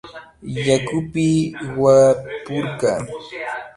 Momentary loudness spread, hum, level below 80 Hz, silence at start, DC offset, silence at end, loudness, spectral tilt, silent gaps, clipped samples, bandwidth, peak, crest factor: 17 LU; none; -50 dBFS; 0.05 s; under 0.1%; 0.05 s; -19 LUFS; -6 dB/octave; none; under 0.1%; 11.5 kHz; -2 dBFS; 18 dB